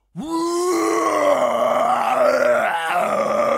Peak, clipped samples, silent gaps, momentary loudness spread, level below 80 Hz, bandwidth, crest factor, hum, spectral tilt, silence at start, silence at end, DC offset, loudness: -4 dBFS; under 0.1%; none; 4 LU; -64 dBFS; 16 kHz; 14 dB; none; -3.5 dB/octave; 0.15 s; 0 s; under 0.1%; -19 LUFS